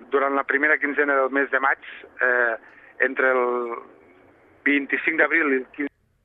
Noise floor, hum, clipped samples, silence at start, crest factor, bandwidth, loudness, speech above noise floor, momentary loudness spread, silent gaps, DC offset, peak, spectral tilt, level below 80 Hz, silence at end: -54 dBFS; none; under 0.1%; 0 s; 18 dB; 4 kHz; -22 LUFS; 32 dB; 13 LU; none; under 0.1%; -6 dBFS; -7 dB/octave; -72 dBFS; 0.35 s